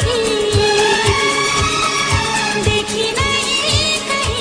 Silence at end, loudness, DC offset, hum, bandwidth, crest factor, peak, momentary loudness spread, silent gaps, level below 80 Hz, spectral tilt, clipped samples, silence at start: 0 s; -15 LUFS; under 0.1%; none; 10.5 kHz; 14 dB; -2 dBFS; 3 LU; none; -32 dBFS; -3 dB/octave; under 0.1%; 0 s